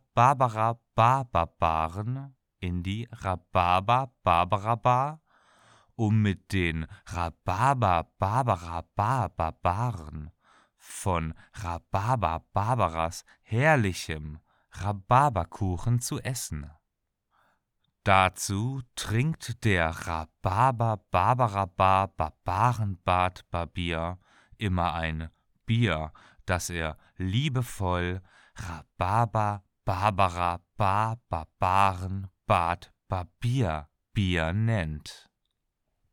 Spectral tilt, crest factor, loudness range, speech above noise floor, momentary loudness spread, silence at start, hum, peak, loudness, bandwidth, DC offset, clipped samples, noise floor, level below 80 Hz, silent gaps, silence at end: -5.5 dB/octave; 22 dB; 4 LU; 54 dB; 13 LU; 0.15 s; none; -6 dBFS; -28 LUFS; 17 kHz; under 0.1%; under 0.1%; -81 dBFS; -48 dBFS; none; 0.95 s